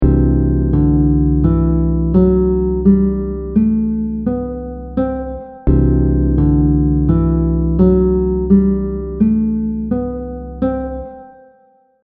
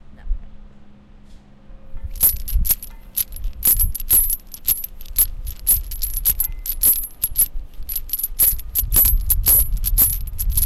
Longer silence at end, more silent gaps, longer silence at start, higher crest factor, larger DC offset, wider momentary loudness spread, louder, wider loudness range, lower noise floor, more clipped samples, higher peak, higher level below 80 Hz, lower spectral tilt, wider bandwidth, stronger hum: first, 0.75 s vs 0 s; neither; about the same, 0 s vs 0.05 s; about the same, 14 dB vs 18 dB; neither; second, 10 LU vs 13 LU; about the same, -15 LUFS vs -17 LUFS; about the same, 4 LU vs 5 LU; first, -52 dBFS vs -42 dBFS; neither; about the same, 0 dBFS vs -2 dBFS; first, -20 dBFS vs -26 dBFS; first, -13 dB/octave vs -1.5 dB/octave; second, 2.6 kHz vs 17 kHz; neither